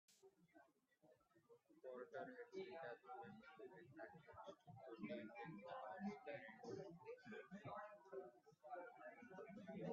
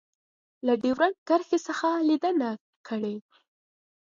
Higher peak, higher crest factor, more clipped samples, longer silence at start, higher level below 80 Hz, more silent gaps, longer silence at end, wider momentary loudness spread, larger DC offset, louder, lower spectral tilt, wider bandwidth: second, -38 dBFS vs -10 dBFS; about the same, 20 dB vs 18 dB; neither; second, 0.1 s vs 0.65 s; second, under -90 dBFS vs -74 dBFS; second, none vs 1.18-1.26 s, 2.61-2.84 s; second, 0 s vs 0.85 s; second, 8 LU vs 11 LU; neither; second, -57 LUFS vs -27 LUFS; about the same, -5 dB/octave vs -5 dB/octave; about the same, 7 kHz vs 7.6 kHz